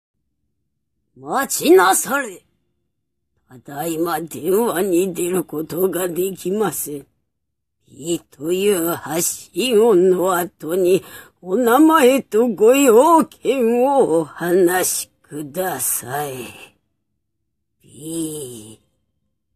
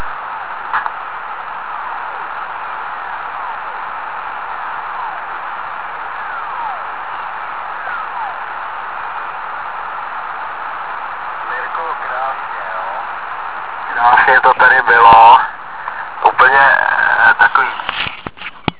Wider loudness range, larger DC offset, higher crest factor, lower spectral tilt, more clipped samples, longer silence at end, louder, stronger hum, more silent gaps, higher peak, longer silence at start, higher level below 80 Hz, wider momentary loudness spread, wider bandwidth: second, 10 LU vs 15 LU; second, under 0.1% vs 1%; about the same, 18 dB vs 16 dB; second, -4 dB/octave vs -6.5 dB/octave; second, under 0.1% vs 0.4%; first, 0.8 s vs 0.1 s; about the same, -17 LUFS vs -15 LUFS; neither; neither; about the same, -2 dBFS vs 0 dBFS; first, 1.2 s vs 0 s; second, -62 dBFS vs -50 dBFS; about the same, 16 LU vs 16 LU; first, 15 kHz vs 4 kHz